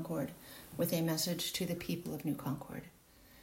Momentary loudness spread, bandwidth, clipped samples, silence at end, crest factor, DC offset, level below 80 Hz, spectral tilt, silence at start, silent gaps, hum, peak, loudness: 15 LU; 16 kHz; under 0.1%; 0 s; 16 dB; under 0.1%; -66 dBFS; -4.5 dB/octave; 0 s; none; none; -22 dBFS; -37 LUFS